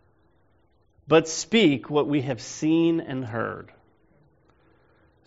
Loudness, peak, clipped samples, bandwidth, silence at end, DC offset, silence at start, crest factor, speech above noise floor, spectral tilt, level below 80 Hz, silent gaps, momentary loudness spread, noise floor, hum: -24 LUFS; -6 dBFS; under 0.1%; 8 kHz; 1.65 s; under 0.1%; 1.05 s; 20 dB; 41 dB; -4.5 dB/octave; -64 dBFS; none; 11 LU; -65 dBFS; none